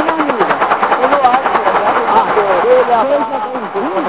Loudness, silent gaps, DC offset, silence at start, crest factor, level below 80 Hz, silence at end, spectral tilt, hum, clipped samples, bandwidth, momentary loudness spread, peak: -12 LUFS; none; 0.4%; 0 s; 12 dB; -52 dBFS; 0 s; -8.5 dB/octave; none; under 0.1%; 4 kHz; 7 LU; 0 dBFS